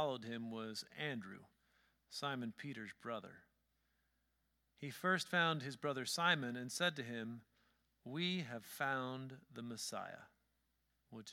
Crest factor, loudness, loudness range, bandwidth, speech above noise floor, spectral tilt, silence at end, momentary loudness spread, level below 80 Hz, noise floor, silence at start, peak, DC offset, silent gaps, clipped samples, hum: 24 dB; -42 LUFS; 10 LU; 17 kHz; 40 dB; -4 dB/octave; 0 s; 17 LU; -86 dBFS; -83 dBFS; 0 s; -20 dBFS; under 0.1%; none; under 0.1%; none